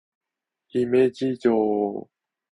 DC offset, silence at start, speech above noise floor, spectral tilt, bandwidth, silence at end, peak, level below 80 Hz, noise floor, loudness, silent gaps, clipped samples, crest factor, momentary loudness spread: under 0.1%; 0.75 s; 54 dB; -7.5 dB/octave; 10.5 kHz; 0.5 s; -8 dBFS; -62 dBFS; -76 dBFS; -23 LUFS; none; under 0.1%; 16 dB; 9 LU